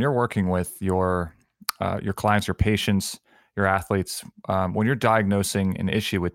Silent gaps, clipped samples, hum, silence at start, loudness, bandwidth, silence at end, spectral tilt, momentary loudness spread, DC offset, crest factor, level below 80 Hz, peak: none; under 0.1%; none; 0 s; -24 LUFS; 17 kHz; 0.05 s; -5.5 dB/octave; 11 LU; under 0.1%; 22 dB; -44 dBFS; -2 dBFS